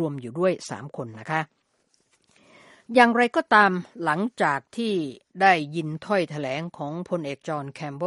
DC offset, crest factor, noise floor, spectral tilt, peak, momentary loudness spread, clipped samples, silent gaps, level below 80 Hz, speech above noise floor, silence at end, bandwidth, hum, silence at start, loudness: under 0.1%; 24 dB; -69 dBFS; -5.5 dB/octave; -2 dBFS; 16 LU; under 0.1%; none; -72 dBFS; 44 dB; 0 s; 11.5 kHz; none; 0 s; -24 LUFS